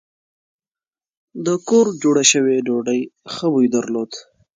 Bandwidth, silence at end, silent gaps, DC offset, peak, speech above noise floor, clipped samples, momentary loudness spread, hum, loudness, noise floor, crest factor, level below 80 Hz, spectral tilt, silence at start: 9.6 kHz; 0.35 s; none; under 0.1%; 0 dBFS; over 73 dB; under 0.1%; 15 LU; none; -17 LUFS; under -90 dBFS; 18 dB; -68 dBFS; -3.5 dB/octave; 1.35 s